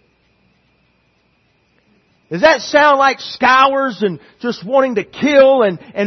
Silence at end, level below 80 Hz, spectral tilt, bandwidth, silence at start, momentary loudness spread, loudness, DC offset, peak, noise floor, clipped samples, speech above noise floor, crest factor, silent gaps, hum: 0 s; -56 dBFS; -4.5 dB/octave; 6.4 kHz; 2.3 s; 12 LU; -13 LUFS; under 0.1%; 0 dBFS; -59 dBFS; under 0.1%; 46 dB; 16 dB; none; none